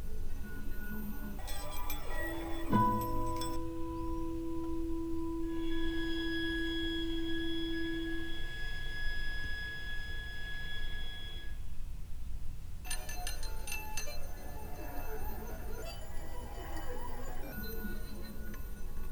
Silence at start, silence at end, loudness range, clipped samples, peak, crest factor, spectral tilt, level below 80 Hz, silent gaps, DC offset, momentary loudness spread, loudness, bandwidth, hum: 0 s; 0 s; 8 LU; under 0.1%; -16 dBFS; 18 dB; -4.5 dB/octave; -40 dBFS; none; under 0.1%; 11 LU; -40 LUFS; over 20 kHz; none